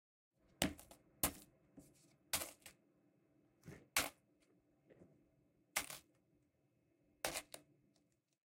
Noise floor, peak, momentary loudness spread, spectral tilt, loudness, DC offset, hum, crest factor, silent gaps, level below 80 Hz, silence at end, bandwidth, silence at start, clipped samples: -81 dBFS; -18 dBFS; 21 LU; -1.5 dB/octave; -43 LUFS; under 0.1%; none; 32 dB; none; -68 dBFS; 0.85 s; 16.5 kHz; 0.6 s; under 0.1%